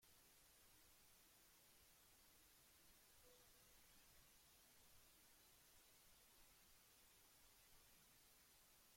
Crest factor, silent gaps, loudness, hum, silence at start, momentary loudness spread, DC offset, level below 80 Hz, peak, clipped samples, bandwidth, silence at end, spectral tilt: 14 dB; none; -70 LUFS; none; 0 s; 0 LU; under 0.1%; -84 dBFS; -58 dBFS; under 0.1%; 16.5 kHz; 0 s; -1.5 dB/octave